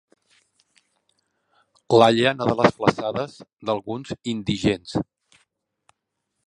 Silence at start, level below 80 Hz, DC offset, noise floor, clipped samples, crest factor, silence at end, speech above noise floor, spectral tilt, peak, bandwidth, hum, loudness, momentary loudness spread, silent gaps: 1.9 s; -54 dBFS; under 0.1%; -78 dBFS; under 0.1%; 24 dB; 1.45 s; 57 dB; -6 dB/octave; 0 dBFS; 11 kHz; none; -22 LUFS; 15 LU; 3.53-3.57 s